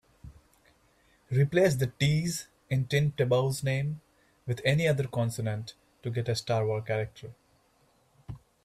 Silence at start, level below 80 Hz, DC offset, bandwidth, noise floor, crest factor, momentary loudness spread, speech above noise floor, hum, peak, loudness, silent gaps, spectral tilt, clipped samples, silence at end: 0.25 s; -58 dBFS; under 0.1%; 14.5 kHz; -67 dBFS; 18 dB; 18 LU; 39 dB; none; -12 dBFS; -29 LUFS; none; -6 dB/octave; under 0.1%; 0.25 s